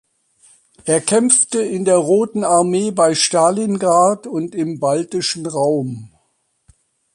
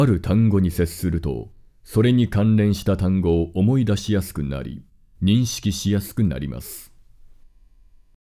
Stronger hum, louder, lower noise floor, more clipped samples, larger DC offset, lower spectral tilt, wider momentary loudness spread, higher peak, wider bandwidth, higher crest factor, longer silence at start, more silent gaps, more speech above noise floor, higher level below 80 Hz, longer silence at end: neither; first, -16 LUFS vs -21 LUFS; first, -66 dBFS vs -51 dBFS; neither; neither; second, -4 dB/octave vs -7 dB/octave; second, 10 LU vs 14 LU; first, 0 dBFS vs -6 dBFS; second, 11.5 kHz vs 16 kHz; about the same, 16 dB vs 14 dB; first, 0.85 s vs 0 s; neither; first, 50 dB vs 31 dB; second, -62 dBFS vs -36 dBFS; second, 1.05 s vs 1.45 s